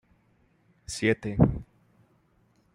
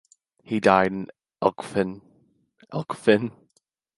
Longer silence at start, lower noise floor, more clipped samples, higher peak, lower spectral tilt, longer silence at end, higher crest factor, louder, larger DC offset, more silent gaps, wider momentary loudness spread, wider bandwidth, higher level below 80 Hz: first, 0.9 s vs 0.5 s; second, -66 dBFS vs -70 dBFS; neither; second, -6 dBFS vs -2 dBFS; about the same, -6.5 dB/octave vs -6.5 dB/octave; first, 1.1 s vs 0.65 s; about the same, 24 dB vs 24 dB; about the same, -26 LUFS vs -24 LUFS; neither; neither; about the same, 17 LU vs 15 LU; about the same, 12.5 kHz vs 11.5 kHz; first, -46 dBFS vs -60 dBFS